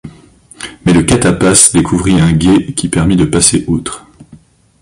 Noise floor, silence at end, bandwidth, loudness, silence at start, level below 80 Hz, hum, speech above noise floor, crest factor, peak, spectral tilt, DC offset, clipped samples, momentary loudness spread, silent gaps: -41 dBFS; 0.45 s; 16 kHz; -9 LUFS; 0.05 s; -30 dBFS; none; 32 dB; 12 dB; 0 dBFS; -4.5 dB/octave; under 0.1%; 0.3%; 14 LU; none